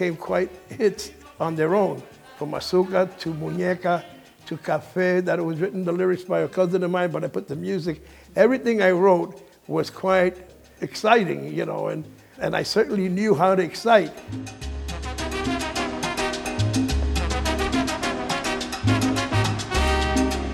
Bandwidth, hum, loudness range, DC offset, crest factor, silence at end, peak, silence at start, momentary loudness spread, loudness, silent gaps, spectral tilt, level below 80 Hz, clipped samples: 18 kHz; none; 3 LU; under 0.1%; 22 dB; 0 s; -2 dBFS; 0 s; 12 LU; -23 LUFS; none; -5.5 dB/octave; -36 dBFS; under 0.1%